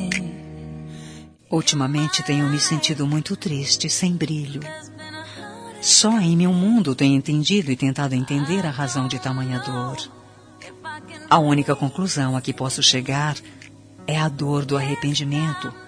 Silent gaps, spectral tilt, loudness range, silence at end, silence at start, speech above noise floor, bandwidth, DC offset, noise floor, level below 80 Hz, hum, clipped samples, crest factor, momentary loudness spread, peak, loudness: none; -4 dB/octave; 5 LU; 0 s; 0 s; 24 dB; 11 kHz; under 0.1%; -45 dBFS; -56 dBFS; none; under 0.1%; 20 dB; 19 LU; -2 dBFS; -20 LUFS